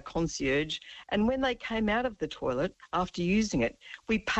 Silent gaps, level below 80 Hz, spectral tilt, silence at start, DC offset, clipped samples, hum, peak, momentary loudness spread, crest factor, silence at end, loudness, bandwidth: none; -50 dBFS; -5 dB/octave; 0.05 s; under 0.1%; under 0.1%; none; -16 dBFS; 7 LU; 14 dB; 0 s; -30 LUFS; 8.4 kHz